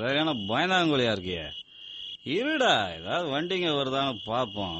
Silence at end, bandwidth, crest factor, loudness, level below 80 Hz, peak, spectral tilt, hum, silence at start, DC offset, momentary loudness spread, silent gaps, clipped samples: 0 s; 8.4 kHz; 18 dB; -27 LUFS; -60 dBFS; -10 dBFS; -4.5 dB/octave; none; 0 s; under 0.1%; 14 LU; none; under 0.1%